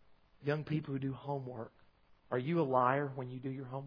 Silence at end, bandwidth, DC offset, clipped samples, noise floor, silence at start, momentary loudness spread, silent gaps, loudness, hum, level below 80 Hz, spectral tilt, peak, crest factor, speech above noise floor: 0 s; 5.2 kHz; under 0.1%; under 0.1%; -65 dBFS; 0.1 s; 12 LU; none; -36 LUFS; none; -72 dBFS; -6.5 dB/octave; -16 dBFS; 22 dB; 30 dB